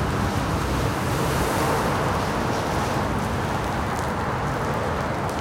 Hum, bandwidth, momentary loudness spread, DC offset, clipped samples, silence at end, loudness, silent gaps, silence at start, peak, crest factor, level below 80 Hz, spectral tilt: none; 17 kHz; 3 LU; under 0.1%; under 0.1%; 0 s; -24 LUFS; none; 0 s; -10 dBFS; 14 dB; -36 dBFS; -5.5 dB/octave